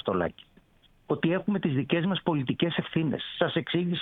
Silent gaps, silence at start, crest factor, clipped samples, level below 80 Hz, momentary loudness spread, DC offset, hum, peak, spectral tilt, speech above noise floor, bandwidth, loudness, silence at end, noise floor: none; 0.05 s; 22 dB; under 0.1%; -62 dBFS; 3 LU; under 0.1%; none; -6 dBFS; -9.5 dB/octave; 34 dB; 4.1 kHz; -28 LUFS; 0 s; -61 dBFS